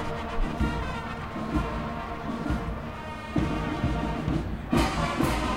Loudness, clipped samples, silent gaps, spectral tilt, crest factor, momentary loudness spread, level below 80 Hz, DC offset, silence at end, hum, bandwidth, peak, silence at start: -30 LUFS; under 0.1%; none; -6 dB/octave; 18 dB; 8 LU; -34 dBFS; under 0.1%; 0 s; none; 16 kHz; -10 dBFS; 0 s